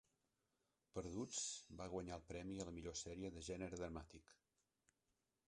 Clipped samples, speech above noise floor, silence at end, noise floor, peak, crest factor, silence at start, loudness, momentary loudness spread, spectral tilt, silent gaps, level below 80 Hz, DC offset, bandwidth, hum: under 0.1%; 39 dB; 1.15 s; -89 dBFS; -34 dBFS; 20 dB; 0.95 s; -50 LUFS; 8 LU; -4 dB/octave; none; -66 dBFS; under 0.1%; 11 kHz; none